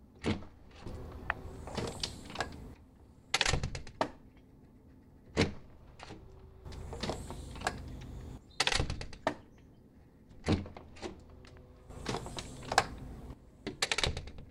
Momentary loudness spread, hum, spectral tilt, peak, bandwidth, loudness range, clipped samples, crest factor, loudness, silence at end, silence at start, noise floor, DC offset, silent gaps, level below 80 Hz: 22 LU; none; -3.5 dB/octave; -8 dBFS; 16 kHz; 5 LU; under 0.1%; 30 dB; -37 LUFS; 0 s; 0 s; -59 dBFS; under 0.1%; none; -50 dBFS